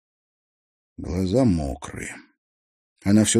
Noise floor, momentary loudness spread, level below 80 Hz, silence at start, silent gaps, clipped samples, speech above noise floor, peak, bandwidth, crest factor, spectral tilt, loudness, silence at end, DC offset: under -90 dBFS; 17 LU; -42 dBFS; 1 s; 2.38-2.96 s; under 0.1%; over 69 dB; -6 dBFS; 14 kHz; 18 dB; -5 dB/octave; -24 LUFS; 0 s; under 0.1%